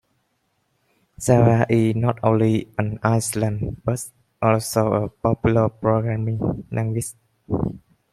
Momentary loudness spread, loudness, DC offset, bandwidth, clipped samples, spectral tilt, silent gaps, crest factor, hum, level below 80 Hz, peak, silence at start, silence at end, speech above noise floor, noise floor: 10 LU; -21 LUFS; under 0.1%; 14.5 kHz; under 0.1%; -7 dB/octave; none; 18 dB; none; -46 dBFS; -2 dBFS; 1.2 s; 0.35 s; 50 dB; -70 dBFS